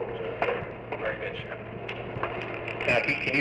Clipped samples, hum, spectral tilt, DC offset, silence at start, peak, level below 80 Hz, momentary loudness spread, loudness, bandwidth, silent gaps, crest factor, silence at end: under 0.1%; none; -6 dB/octave; under 0.1%; 0 s; -12 dBFS; -54 dBFS; 12 LU; -30 LUFS; 11 kHz; none; 18 dB; 0 s